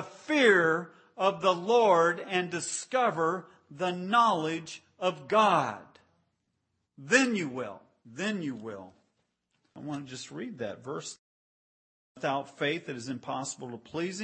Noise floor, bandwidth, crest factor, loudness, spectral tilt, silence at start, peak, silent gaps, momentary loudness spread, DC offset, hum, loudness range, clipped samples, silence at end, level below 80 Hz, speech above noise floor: -79 dBFS; 8.8 kHz; 22 dB; -29 LUFS; -4 dB/octave; 0 s; -8 dBFS; 11.19-12.15 s; 17 LU; under 0.1%; none; 12 LU; under 0.1%; 0 s; -80 dBFS; 50 dB